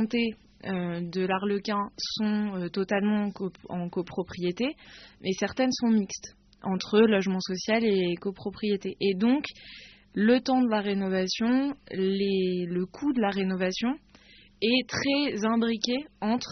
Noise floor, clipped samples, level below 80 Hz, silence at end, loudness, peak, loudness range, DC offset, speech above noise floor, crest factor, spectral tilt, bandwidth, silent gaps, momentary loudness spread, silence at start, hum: -55 dBFS; under 0.1%; -62 dBFS; 0 s; -28 LUFS; -8 dBFS; 4 LU; under 0.1%; 28 dB; 20 dB; -4.5 dB/octave; 6.4 kHz; none; 11 LU; 0 s; none